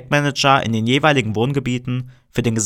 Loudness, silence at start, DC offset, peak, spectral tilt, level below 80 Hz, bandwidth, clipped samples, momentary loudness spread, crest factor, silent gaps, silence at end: -18 LUFS; 0 s; under 0.1%; -2 dBFS; -4.5 dB/octave; -46 dBFS; 16 kHz; under 0.1%; 11 LU; 16 dB; none; 0 s